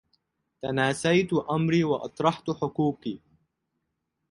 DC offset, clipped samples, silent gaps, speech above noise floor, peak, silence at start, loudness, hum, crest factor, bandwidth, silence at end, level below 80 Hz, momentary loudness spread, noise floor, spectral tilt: under 0.1%; under 0.1%; none; 54 dB; -8 dBFS; 0.65 s; -26 LUFS; none; 20 dB; 11.5 kHz; 1.15 s; -62 dBFS; 13 LU; -80 dBFS; -6 dB/octave